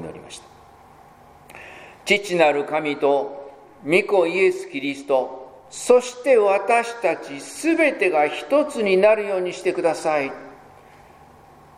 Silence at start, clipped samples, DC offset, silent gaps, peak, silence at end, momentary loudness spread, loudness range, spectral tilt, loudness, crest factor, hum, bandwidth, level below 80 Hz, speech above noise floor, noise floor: 0 s; under 0.1%; under 0.1%; none; -2 dBFS; 1.25 s; 21 LU; 4 LU; -4 dB/octave; -20 LUFS; 20 dB; none; 15.5 kHz; -64 dBFS; 28 dB; -48 dBFS